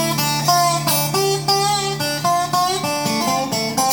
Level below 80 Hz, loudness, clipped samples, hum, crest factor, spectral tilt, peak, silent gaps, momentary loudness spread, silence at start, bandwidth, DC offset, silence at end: -50 dBFS; -18 LUFS; under 0.1%; none; 16 dB; -3 dB/octave; -2 dBFS; none; 4 LU; 0 s; over 20 kHz; under 0.1%; 0 s